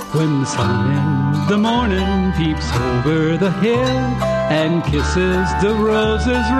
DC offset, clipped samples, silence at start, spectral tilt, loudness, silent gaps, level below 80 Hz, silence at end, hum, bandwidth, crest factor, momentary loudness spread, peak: under 0.1%; under 0.1%; 0 s; -6.5 dB/octave; -17 LUFS; none; -28 dBFS; 0 s; none; 13 kHz; 12 dB; 3 LU; -4 dBFS